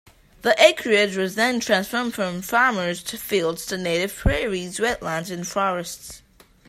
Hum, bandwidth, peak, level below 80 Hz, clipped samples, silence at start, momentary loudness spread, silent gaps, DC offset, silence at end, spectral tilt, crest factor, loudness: none; 16 kHz; 0 dBFS; -38 dBFS; under 0.1%; 0.45 s; 12 LU; none; under 0.1%; 0.5 s; -3.5 dB/octave; 22 dB; -22 LUFS